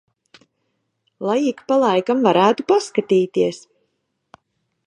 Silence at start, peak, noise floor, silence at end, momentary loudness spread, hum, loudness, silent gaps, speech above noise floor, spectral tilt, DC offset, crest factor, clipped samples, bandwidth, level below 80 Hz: 1.2 s; -2 dBFS; -72 dBFS; 1.3 s; 7 LU; none; -18 LUFS; none; 54 dB; -5.5 dB/octave; under 0.1%; 20 dB; under 0.1%; 11 kHz; -72 dBFS